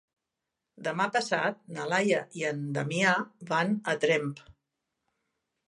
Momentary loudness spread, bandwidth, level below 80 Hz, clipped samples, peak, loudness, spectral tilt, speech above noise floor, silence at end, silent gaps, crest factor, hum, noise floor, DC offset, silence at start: 9 LU; 11.5 kHz; -74 dBFS; under 0.1%; -10 dBFS; -29 LUFS; -4.5 dB/octave; 58 dB; 1.15 s; none; 20 dB; none; -86 dBFS; under 0.1%; 0.8 s